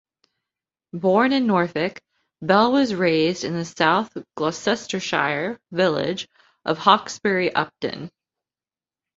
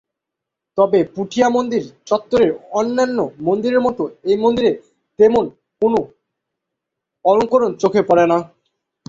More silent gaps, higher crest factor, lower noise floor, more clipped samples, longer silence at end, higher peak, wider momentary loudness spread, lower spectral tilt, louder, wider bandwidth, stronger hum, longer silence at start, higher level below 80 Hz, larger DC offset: neither; first, 22 dB vs 16 dB; first, under -90 dBFS vs -82 dBFS; neither; first, 1.1 s vs 0.65 s; about the same, 0 dBFS vs -2 dBFS; first, 13 LU vs 8 LU; about the same, -5 dB/octave vs -6 dB/octave; second, -21 LUFS vs -17 LUFS; about the same, 7.8 kHz vs 7.6 kHz; neither; first, 0.95 s vs 0.75 s; second, -64 dBFS vs -54 dBFS; neither